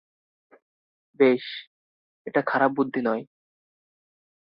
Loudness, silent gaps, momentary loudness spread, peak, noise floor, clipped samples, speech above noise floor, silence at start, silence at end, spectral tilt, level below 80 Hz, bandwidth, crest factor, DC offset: -24 LUFS; 1.67-2.25 s; 16 LU; -6 dBFS; under -90 dBFS; under 0.1%; over 67 dB; 1.2 s; 1.35 s; -9.5 dB/octave; -76 dBFS; 5.6 kHz; 22 dB; under 0.1%